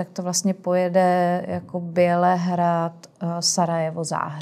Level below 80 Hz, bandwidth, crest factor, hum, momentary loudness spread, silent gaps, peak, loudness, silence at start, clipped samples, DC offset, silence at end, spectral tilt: -70 dBFS; 14.5 kHz; 16 dB; none; 10 LU; none; -6 dBFS; -22 LUFS; 0 s; under 0.1%; under 0.1%; 0 s; -4.5 dB/octave